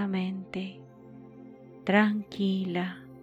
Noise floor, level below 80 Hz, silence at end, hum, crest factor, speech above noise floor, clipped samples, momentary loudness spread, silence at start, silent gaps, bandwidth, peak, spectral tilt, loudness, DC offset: -49 dBFS; -70 dBFS; 0 s; none; 20 dB; 22 dB; under 0.1%; 25 LU; 0 s; none; 7.8 kHz; -10 dBFS; -7.5 dB/octave; -29 LUFS; under 0.1%